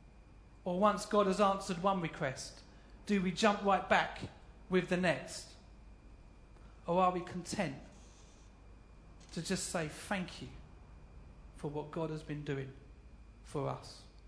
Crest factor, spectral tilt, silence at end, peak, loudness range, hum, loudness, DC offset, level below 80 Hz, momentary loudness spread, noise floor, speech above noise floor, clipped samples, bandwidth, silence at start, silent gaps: 24 dB; -5 dB/octave; 0 s; -12 dBFS; 10 LU; none; -35 LUFS; under 0.1%; -58 dBFS; 20 LU; -58 dBFS; 23 dB; under 0.1%; 11 kHz; 0 s; none